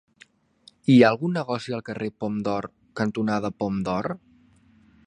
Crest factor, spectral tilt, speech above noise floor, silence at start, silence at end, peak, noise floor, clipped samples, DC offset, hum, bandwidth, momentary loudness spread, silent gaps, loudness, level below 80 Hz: 22 dB; -7 dB/octave; 34 dB; 0.9 s; 0.9 s; -4 dBFS; -57 dBFS; under 0.1%; under 0.1%; none; 9.4 kHz; 15 LU; none; -24 LUFS; -58 dBFS